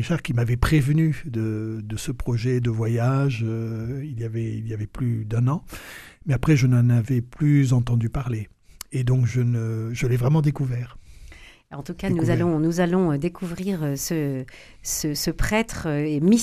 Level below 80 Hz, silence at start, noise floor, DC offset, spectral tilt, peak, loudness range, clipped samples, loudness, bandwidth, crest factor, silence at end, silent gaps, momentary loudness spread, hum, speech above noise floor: -40 dBFS; 0 s; -45 dBFS; under 0.1%; -6.5 dB/octave; -4 dBFS; 4 LU; under 0.1%; -23 LUFS; 14.5 kHz; 18 dB; 0 s; none; 12 LU; none; 22 dB